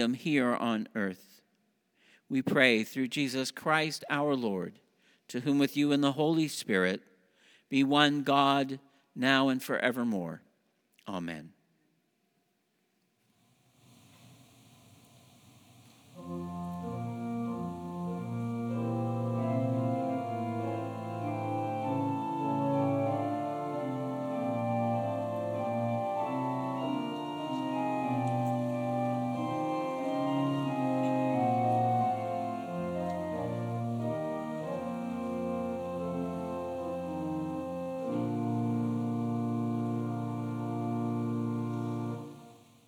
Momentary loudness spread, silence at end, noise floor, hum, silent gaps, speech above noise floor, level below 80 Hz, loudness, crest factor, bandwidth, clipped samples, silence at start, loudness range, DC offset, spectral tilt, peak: 10 LU; 0.3 s; -76 dBFS; none; none; 47 dB; -72 dBFS; -32 LUFS; 24 dB; over 20 kHz; under 0.1%; 0 s; 9 LU; under 0.1%; -6 dB/octave; -8 dBFS